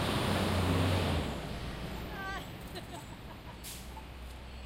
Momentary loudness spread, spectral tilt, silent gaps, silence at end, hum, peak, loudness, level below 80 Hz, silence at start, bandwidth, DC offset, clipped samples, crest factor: 17 LU; -5.5 dB/octave; none; 0 s; none; -18 dBFS; -35 LUFS; -46 dBFS; 0 s; 16 kHz; under 0.1%; under 0.1%; 18 dB